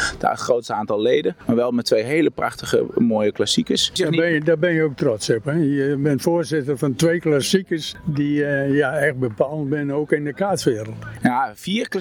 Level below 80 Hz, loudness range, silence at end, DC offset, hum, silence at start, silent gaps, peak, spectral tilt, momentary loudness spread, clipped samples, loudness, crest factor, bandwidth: -52 dBFS; 2 LU; 0 s; under 0.1%; none; 0 s; none; -2 dBFS; -5 dB/octave; 5 LU; under 0.1%; -20 LUFS; 16 dB; 19 kHz